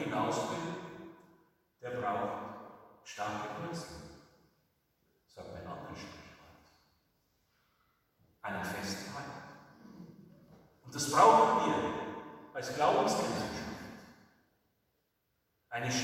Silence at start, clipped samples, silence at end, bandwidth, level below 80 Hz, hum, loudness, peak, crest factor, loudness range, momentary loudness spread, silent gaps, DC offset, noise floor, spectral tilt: 0 s; under 0.1%; 0 s; 16.5 kHz; -70 dBFS; none; -33 LUFS; -10 dBFS; 26 dB; 21 LU; 25 LU; none; under 0.1%; -80 dBFS; -4 dB/octave